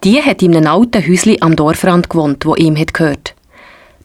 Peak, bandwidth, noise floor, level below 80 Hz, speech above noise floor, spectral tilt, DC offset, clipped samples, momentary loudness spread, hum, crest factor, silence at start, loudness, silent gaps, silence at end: 0 dBFS; 15.5 kHz; -41 dBFS; -38 dBFS; 31 dB; -6 dB/octave; under 0.1%; under 0.1%; 5 LU; none; 10 dB; 0 s; -11 LUFS; none; 0.75 s